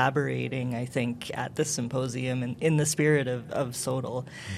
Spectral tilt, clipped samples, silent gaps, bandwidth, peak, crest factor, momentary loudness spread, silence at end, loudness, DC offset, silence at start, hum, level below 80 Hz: -5 dB/octave; under 0.1%; none; 15.5 kHz; -8 dBFS; 20 dB; 8 LU; 0 s; -29 LUFS; under 0.1%; 0 s; none; -64 dBFS